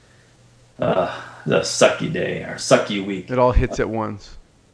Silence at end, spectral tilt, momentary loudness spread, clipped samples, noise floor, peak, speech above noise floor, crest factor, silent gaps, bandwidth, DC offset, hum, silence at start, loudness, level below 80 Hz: 0.35 s; -4.5 dB/octave; 10 LU; under 0.1%; -52 dBFS; 0 dBFS; 32 dB; 22 dB; none; 11 kHz; under 0.1%; none; 0.8 s; -20 LUFS; -30 dBFS